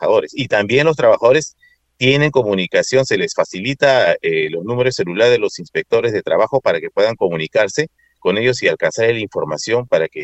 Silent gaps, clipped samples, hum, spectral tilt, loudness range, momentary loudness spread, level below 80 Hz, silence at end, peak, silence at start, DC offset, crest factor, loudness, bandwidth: none; under 0.1%; none; -4.5 dB/octave; 2 LU; 7 LU; -52 dBFS; 0 s; 0 dBFS; 0 s; under 0.1%; 16 dB; -16 LUFS; 8.4 kHz